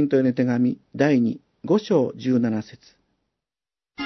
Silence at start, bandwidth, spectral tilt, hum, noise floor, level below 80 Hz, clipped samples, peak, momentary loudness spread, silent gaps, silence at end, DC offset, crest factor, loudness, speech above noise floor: 0 s; 6.2 kHz; -8 dB/octave; none; under -90 dBFS; -66 dBFS; under 0.1%; -6 dBFS; 8 LU; none; 0 s; under 0.1%; 18 dB; -22 LUFS; over 69 dB